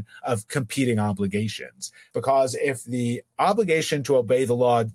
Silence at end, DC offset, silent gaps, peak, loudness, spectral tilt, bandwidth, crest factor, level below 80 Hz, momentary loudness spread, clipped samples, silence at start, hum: 0 s; under 0.1%; none; -8 dBFS; -24 LUFS; -5.5 dB/octave; 16 kHz; 16 dB; -68 dBFS; 9 LU; under 0.1%; 0 s; none